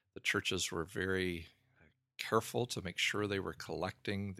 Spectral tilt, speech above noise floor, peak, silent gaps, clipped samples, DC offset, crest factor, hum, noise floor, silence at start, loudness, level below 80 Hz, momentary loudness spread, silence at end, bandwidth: -3.5 dB/octave; 33 dB; -16 dBFS; none; under 0.1%; under 0.1%; 22 dB; none; -70 dBFS; 0.15 s; -37 LUFS; -66 dBFS; 8 LU; 0 s; 16 kHz